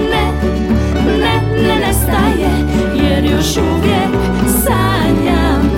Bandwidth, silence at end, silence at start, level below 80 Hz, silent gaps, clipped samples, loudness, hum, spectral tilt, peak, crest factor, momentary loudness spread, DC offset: 17 kHz; 0 s; 0 s; -20 dBFS; none; under 0.1%; -13 LUFS; none; -5.5 dB/octave; 0 dBFS; 12 dB; 2 LU; under 0.1%